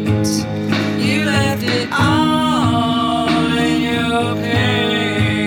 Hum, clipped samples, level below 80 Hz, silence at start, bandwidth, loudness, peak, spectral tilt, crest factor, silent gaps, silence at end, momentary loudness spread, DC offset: none; under 0.1%; -40 dBFS; 0 s; 18 kHz; -16 LUFS; -2 dBFS; -5.5 dB/octave; 14 dB; none; 0 s; 3 LU; under 0.1%